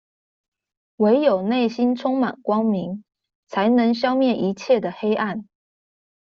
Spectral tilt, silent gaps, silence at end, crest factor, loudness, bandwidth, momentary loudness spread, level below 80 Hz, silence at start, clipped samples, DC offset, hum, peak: -5 dB/octave; 3.35-3.43 s; 0.95 s; 16 dB; -21 LUFS; 7 kHz; 9 LU; -66 dBFS; 1 s; under 0.1%; under 0.1%; none; -6 dBFS